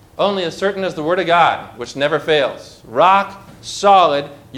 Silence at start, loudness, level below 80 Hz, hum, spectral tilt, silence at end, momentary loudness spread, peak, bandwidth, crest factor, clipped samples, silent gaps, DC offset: 0.2 s; -16 LUFS; -54 dBFS; none; -4 dB/octave; 0 s; 15 LU; -2 dBFS; 14 kHz; 16 dB; under 0.1%; none; under 0.1%